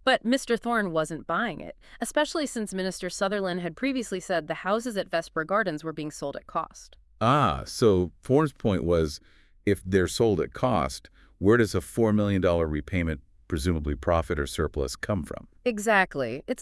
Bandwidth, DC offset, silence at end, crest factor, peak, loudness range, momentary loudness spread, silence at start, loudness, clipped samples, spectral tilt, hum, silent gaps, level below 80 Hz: 12 kHz; under 0.1%; 0 s; 18 dB; -8 dBFS; 4 LU; 10 LU; 0.05 s; -27 LUFS; under 0.1%; -5.5 dB/octave; none; none; -46 dBFS